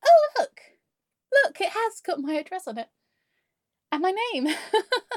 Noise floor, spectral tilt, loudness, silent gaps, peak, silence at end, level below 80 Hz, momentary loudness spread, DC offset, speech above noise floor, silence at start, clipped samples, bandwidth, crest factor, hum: -84 dBFS; -2 dB/octave; -25 LUFS; none; -8 dBFS; 0 s; under -90 dBFS; 13 LU; under 0.1%; 58 dB; 0.05 s; under 0.1%; 14 kHz; 18 dB; none